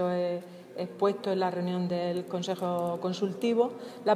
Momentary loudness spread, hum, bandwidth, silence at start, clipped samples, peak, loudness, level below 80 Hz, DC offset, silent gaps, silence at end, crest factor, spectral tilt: 7 LU; none; 15 kHz; 0 s; under 0.1%; -12 dBFS; -31 LUFS; -78 dBFS; under 0.1%; none; 0 s; 16 dB; -6.5 dB/octave